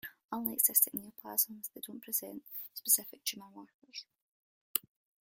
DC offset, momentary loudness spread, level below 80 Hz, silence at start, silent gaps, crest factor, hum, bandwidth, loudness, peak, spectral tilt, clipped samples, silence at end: under 0.1%; 21 LU; -82 dBFS; 0.05 s; 0.24-0.29 s, 3.74-3.82 s, 4.22-4.74 s; 28 dB; none; 16.5 kHz; -32 LUFS; -10 dBFS; -0.5 dB/octave; under 0.1%; 0.5 s